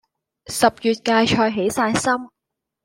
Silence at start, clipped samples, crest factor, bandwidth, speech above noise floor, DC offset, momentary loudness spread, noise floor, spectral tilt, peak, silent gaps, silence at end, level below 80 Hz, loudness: 0.5 s; under 0.1%; 18 dB; 16.5 kHz; 63 dB; under 0.1%; 5 LU; -82 dBFS; -4 dB/octave; -2 dBFS; none; 0.55 s; -52 dBFS; -19 LUFS